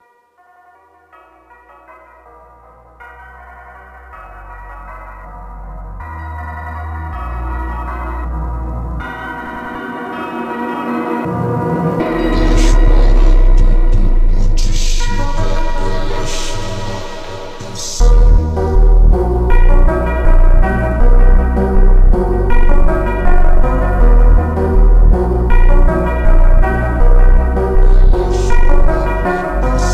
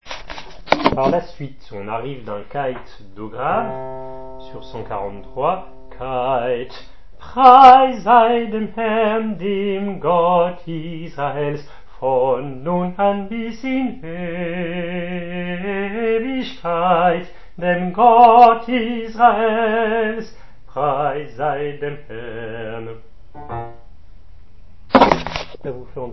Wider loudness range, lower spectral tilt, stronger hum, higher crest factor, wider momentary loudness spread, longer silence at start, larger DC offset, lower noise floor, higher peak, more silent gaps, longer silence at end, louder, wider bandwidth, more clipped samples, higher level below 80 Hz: about the same, 14 LU vs 13 LU; about the same, -6.5 dB/octave vs -7 dB/octave; neither; second, 10 dB vs 18 dB; about the same, 18 LU vs 20 LU; first, 3 s vs 0 s; second, under 0.1% vs 2%; first, -51 dBFS vs -44 dBFS; about the same, 0 dBFS vs 0 dBFS; neither; about the same, 0 s vs 0 s; about the same, -16 LUFS vs -17 LUFS; first, 8.2 kHz vs 6.2 kHz; neither; first, -10 dBFS vs -44 dBFS